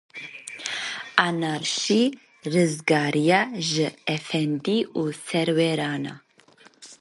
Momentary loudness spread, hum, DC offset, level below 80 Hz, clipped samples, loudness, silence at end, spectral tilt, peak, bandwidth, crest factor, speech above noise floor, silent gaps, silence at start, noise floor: 11 LU; none; under 0.1%; -72 dBFS; under 0.1%; -24 LUFS; 0.05 s; -4.5 dB/octave; 0 dBFS; 11.5 kHz; 24 dB; 31 dB; none; 0.15 s; -55 dBFS